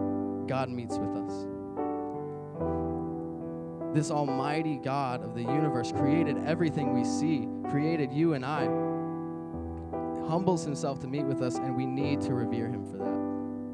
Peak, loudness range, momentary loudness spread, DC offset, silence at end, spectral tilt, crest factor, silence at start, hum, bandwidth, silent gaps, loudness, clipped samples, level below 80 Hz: -12 dBFS; 5 LU; 9 LU; under 0.1%; 0 s; -7 dB/octave; 20 dB; 0 s; none; 10.5 kHz; none; -31 LUFS; under 0.1%; -58 dBFS